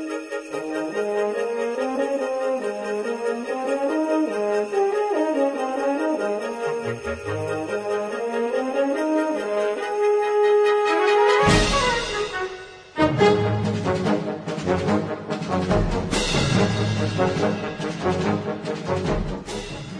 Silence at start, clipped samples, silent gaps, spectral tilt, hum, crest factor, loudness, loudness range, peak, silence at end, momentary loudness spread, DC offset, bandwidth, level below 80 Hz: 0 s; under 0.1%; none; -5.5 dB/octave; none; 20 dB; -23 LUFS; 6 LU; -4 dBFS; 0 s; 10 LU; under 0.1%; 10.5 kHz; -40 dBFS